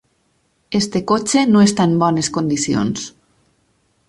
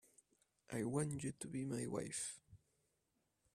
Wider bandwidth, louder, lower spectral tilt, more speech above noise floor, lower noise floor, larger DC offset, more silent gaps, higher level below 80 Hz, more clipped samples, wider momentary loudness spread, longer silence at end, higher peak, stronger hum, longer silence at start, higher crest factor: second, 11.5 kHz vs 15 kHz; first, -16 LUFS vs -44 LUFS; about the same, -5 dB/octave vs -5 dB/octave; first, 47 dB vs 41 dB; second, -63 dBFS vs -85 dBFS; neither; neither; first, -52 dBFS vs -74 dBFS; neither; first, 10 LU vs 7 LU; about the same, 1 s vs 1 s; first, -2 dBFS vs -26 dBFS; neither; about the same, 0.7 s vs 0.7 s; about the same, 16 dB vs 20 dB